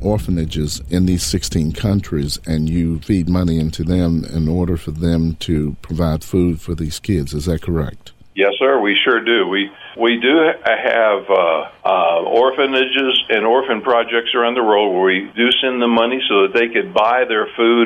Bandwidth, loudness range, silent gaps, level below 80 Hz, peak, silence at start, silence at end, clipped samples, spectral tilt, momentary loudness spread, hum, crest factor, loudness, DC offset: 16.5 kHz; 5 LU; none; -34 dBFS; -4 dBFS; 0 s; 0 s; under 0.1%; -5.5 dB/octave; 7 LU; none; 12 dB; -16 LUFS; under 0.1%